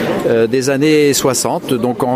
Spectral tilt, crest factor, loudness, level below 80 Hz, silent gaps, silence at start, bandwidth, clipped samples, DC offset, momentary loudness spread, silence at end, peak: -4.5 dB/octave; 12 dB; -13 LUFS; -50 dBFS; none; 0 s; 16 kHz; under 0.1%; under 0.1%; 6 LU; 0 s; -2 dBFS